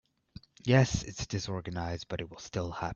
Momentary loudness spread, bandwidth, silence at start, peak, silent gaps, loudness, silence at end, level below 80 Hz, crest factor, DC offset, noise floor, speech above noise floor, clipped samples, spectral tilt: 13 LU; 7.6 kHz; 0.65 s; -10 dBFS; none; -32 LUFS; 0 s; -52 dBFS; 22 dB; under 0.1%; -54 dBFS; 23 dB; under 0.1%; -5.5 dB/octave